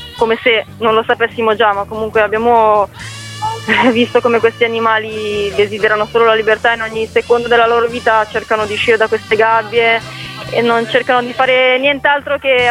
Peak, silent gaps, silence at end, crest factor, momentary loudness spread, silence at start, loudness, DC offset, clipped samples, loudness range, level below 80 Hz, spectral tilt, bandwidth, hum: 0 dBFS; none; 0 s; 12 dB; 6 LU; 0 s; -13 LUFS; under 0.1%; under 0.1%; 1 LU; -46 dBFS; -4.5 dB/octave; 13 kHz; none